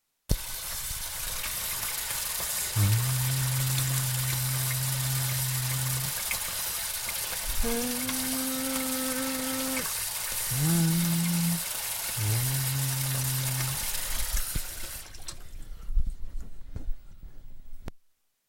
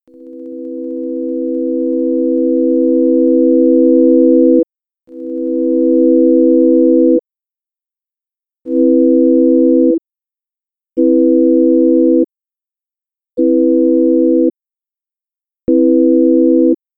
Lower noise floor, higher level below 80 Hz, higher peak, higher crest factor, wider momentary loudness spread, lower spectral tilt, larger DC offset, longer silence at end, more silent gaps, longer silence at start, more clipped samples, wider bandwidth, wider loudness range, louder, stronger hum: second, -66 dBFS vs -90 dBFS; first, -38 dBFS vs -60 dBFS; second, -10 dBFS vs 0 dBFS; first, 20 dB vs 12 dB; first, 16 LU vs 12 LU; second, -3.5 dB/octave vs -12.5 dB/octave; neither; first, 0.5 s vs 0.2 s; neither; about the same, 0.3 s vs 0.2 s; neither; first, 17 kHz vs 1 kHz; first, 8 LU vs 3 LU; second, -28 LUFS vs -11 LUFS; neither